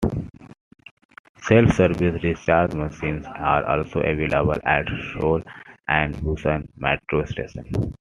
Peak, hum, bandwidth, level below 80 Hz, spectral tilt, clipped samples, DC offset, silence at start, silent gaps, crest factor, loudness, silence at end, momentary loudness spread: 0 dBFS; none; 11 kHz; -40 dBFS; -7 dB/octave; under 0.1%; under 0.1%; 0 s; 0.61-0.71 s, 0.91-0.97 s, 1.05-1.09 s, 1.19-1.35 s; 22 dB; -22 LUFS; 0.05 s; 11 LU